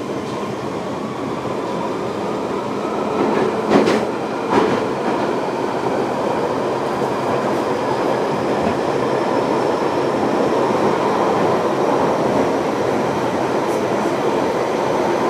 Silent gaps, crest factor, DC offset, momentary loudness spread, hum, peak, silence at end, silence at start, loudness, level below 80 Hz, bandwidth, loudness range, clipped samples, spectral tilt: none; 18 dB; under 0.1%; 6 LU; none; 0 dBFS; 0 s; 0 s; -19 LUFS; -52 dBFS; 15 kHz; 2 LU; under 0.1%; -6 dB/octave